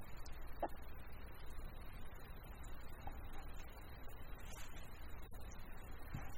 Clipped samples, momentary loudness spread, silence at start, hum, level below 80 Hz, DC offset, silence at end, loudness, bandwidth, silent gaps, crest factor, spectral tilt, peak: under 0.1%; 8 LU; 0 s; none; -52 dBFS; under 0.1%; 0 s; -54 LUFS; 16.5 kHz; none; 18 dB; -5 dB/octave; -30 dBFS